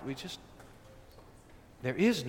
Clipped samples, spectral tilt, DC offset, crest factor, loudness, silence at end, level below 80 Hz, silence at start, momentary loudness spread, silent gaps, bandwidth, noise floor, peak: under 0.1%; -5.5 dB/octave; under 0.1%; 20 dB; -35 LUFS; 0 s; -60 dBFS; 0 s; 27 LU; none; 16.5 kHz; -56 dBFS; -16 dBFS